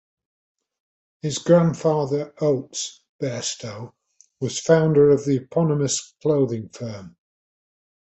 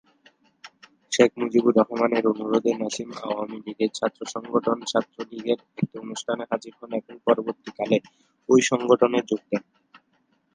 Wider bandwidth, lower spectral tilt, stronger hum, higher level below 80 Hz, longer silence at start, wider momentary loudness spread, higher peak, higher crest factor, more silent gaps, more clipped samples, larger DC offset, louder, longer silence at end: second, 8.2 kHz vs 10 kHz; about the same, -5.5 dB/octave vs -4.5 dB/octave; neither; first, -60 dBFS vs -72 dBFS; first, 1.25 s vs 0.65 s; first, 16 LU vs 13 LU; about the same, -4 dBFS vs -2 dBFS; about the same, 20 dB vs 22 dB; first, 3.09-3.19 s vs none; neither; neither; first, -21 LUFS vs -24 LUFS; first, 1.1 s vs 0.55 s